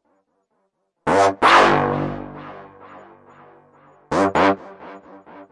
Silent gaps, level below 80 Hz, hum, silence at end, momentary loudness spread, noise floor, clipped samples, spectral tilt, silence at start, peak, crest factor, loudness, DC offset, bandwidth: none; -50 dBFS; none; 0.1 s; 26 LU; -71 dBFS; under 0.1%; -4.5 dB/octave; 1.05 s; -2 dBFS; 20 dB; -17 LUFS; under 0.1%; 11.5 kHz